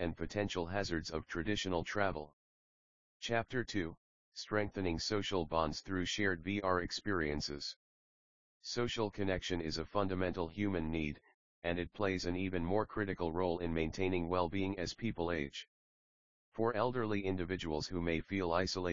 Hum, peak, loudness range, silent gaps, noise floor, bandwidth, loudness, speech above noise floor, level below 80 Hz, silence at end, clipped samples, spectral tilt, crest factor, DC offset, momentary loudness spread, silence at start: none; -16 dBFS; 3 LU; 2.33-3.20 s, 3.97-4.32 s, 7.76-8.60 s, 11.34-11.62 s, 15.68-16.52 s; under -90 dBFS; 7.4 kHz; -37 LUFS; over 53 dB; -56 dBFS; 0 s; under 0.1%; -4 dB/octave; 22 dB; 0.2%; 7 LU; 0 s